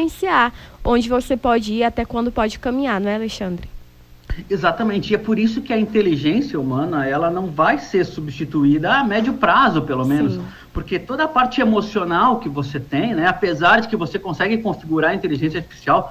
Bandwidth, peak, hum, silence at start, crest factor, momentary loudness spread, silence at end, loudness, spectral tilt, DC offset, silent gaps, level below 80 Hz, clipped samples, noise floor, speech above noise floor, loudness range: 15.5 kHz; -2 dBFS; none; 0 s; 16 dB; 9 LU; 0 s; -19 LUFS; -6.5 dB/octave; under 0.1%; none; -40 dBFS; under 0.1%; -44 dBFS; 25 dB; 4 LU